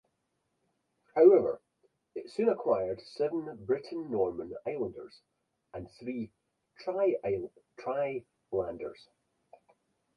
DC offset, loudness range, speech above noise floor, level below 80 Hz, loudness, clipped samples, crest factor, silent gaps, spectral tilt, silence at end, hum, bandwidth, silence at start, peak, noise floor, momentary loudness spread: under 0.1%; 8 LU; 49 dB; -68 dBFS; -31 LUFS; under 0.1%; 24 dB; none; -8 dB/octave; 1.25 s; none; 9 kHz; 1.15 s; -10 dBFS; -80 dBFS; 19 LU